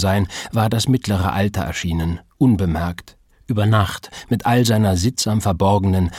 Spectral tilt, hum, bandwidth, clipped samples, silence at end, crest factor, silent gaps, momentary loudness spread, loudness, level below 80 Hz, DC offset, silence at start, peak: -6 dB/octave; none; 16 kHz; under 0.1%; 0 s; 16 dB; none; 8 LU; -19 LUFS; -36 dBFS; under 0.1%; 0 s; -2 dBFS